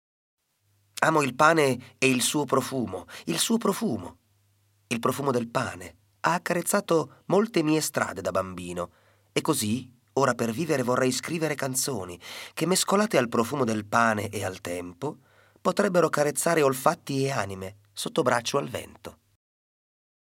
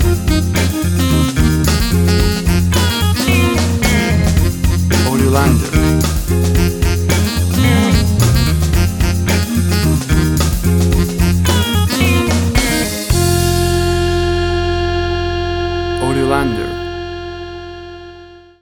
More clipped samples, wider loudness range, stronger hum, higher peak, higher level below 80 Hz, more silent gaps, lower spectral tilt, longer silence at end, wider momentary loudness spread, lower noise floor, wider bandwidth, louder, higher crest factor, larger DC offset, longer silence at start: neither; about the same, 4 LU vs 3 LU; neither; second, -4 dBFS vs 0 dBFS; second, -68 dBFS vs -20 dBFS; neither; about the same, -4 dB/octave vs -5 dB/octave; first, 1.2 s vs 0.25 s; first, 13 LU vs 6 LU; first, -69 dBFS vs -38 dBFS; second, 17 kHz vs over 20 kHz; second, -26 LUFS vs -14 LUFS; first, 22 dB vs 14 dB; neither; first, 1 s vs 0 s